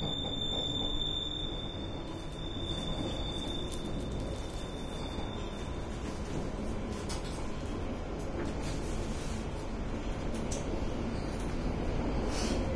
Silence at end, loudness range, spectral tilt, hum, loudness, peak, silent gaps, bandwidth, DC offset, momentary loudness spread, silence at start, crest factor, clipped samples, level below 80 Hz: 0 s; 3 LU; -5 dB/octave; none; -37 LUFS; -20 dBFS; none; 11 kHz; under 0.1%; 7 LU; 0 s; 16 dB; under 0.1%; -40 dBFS